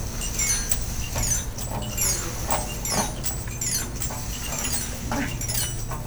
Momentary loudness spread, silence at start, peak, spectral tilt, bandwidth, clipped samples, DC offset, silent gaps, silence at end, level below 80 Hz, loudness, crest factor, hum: 6 LU; 0 s; -4 dBFS; -2.5 dB/octave; over 20 kHz; under 0.1%; under 0.1%; none; 0 s; -34 dBFS; -26 LUFS; 22 dB; none